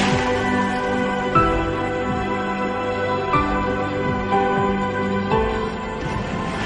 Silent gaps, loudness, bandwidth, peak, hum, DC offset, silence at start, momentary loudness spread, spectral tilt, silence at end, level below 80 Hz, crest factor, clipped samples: none; -21 LUFS; 11 kHz; -4 dBFS; none; under 0.1%; 0 s; 6 LU; -6 dB/octave; 0 s; -36 dBFS; 16 dB; under 0.1%